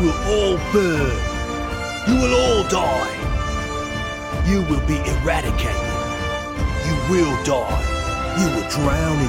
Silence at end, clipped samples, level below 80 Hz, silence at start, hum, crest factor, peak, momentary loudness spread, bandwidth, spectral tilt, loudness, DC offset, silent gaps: 0 s; under 0.1%; -26 dBFS; 0 s; none; 16 dB; -4 dBFS; 7 LU; 16.5 kHz; -5 dB/octave; -20 LUFS; under 0.1%; none